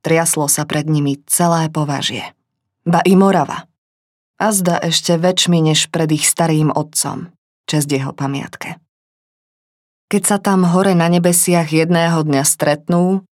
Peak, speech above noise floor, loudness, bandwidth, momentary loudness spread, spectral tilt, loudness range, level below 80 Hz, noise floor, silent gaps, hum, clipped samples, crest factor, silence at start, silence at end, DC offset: 0 dBFS; 25 dB; -15 LUFS; 16.5 kHz; 10 LU; -4.5 dB/octave; 6 LU; -62 dBFS; -40 dBFS; 3.78-4.34 s, 7.38-7.64 s, 8.89-10.08 s; none; under 0.1%; 16 dB; 0.05 s; 0.15 s; under 0.1%